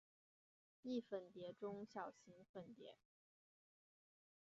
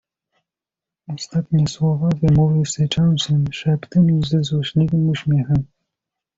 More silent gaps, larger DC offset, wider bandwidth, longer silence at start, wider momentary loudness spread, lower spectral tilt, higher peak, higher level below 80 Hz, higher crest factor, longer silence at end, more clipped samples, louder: first, 2.49-2.54 s vs none; neither; about the same, 7.2 kHz vs 7.8 kHz; second, 0.85 s vs 1.1 s; first, 13 LU vs 7 LU; second, -5 dB/octave vs -6.5 dB/octave; second, -36 dBFS vs -6 dBFS; second, under -90 dBFS vs -44 dBFS; first, 20 dB vs 14 dB; first, 1.45 s vs 0.7 s; neither; second, -53 LUFS vs -18 LUFS